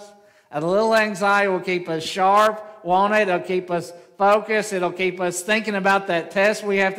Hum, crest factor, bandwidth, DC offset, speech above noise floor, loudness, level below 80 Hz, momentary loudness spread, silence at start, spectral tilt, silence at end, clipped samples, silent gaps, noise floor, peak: none; 16 dB; 16 kHz; under 0.1%; 27 dB; -20 LUFS; -68 dBFS; 8 LU; 0 s; -4 dB/octave; 0 s; under 0.1%; none; -47 dBFS; -4 dBFS